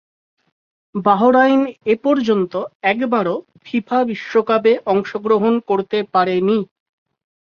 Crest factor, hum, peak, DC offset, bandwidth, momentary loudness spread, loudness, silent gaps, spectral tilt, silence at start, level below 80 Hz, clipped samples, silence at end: 16 dB; none; -2 dBFS; under 0.1%; 6.8 kHz; 10 LU; -17 LUFS; 2.75-2.80 s; -7.5 dB/octave; 0.95 s; -64 dBFS; under 0.1%; 0.95 s